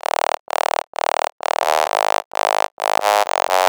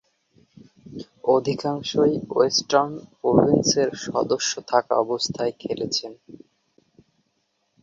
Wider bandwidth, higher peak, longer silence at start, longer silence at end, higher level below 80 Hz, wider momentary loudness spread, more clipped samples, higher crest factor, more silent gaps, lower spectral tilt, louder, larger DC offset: first, over 20 kHz vs 7.8 kHz; about the same, 0 dBFS vs -2 dBFS; first, 1.6 s vs 0.85 s; second, 0 s vs 1.45 s; second, -66 dBFS vs -58 dBFS; second, 5 LU vs 10 LU; neither; about the same, 18 dB vs 22 dB; first, 2.25-2.31 s, 2.72-2.77 s vs none; second, 0.5 dB/octave vs -4 dB/octave; first, -19 LUFS vs -22 LUFS; neither